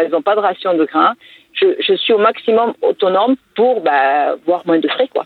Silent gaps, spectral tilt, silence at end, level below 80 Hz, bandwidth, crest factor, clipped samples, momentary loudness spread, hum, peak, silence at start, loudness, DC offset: none; -6.5 dB/octave; 0 s; -72 dBFS; 4.6 kHz; 14 dB; under 0.1%; 4 LU; none; 0 dBFS; 0 s; -14 LUFS; under 0.1%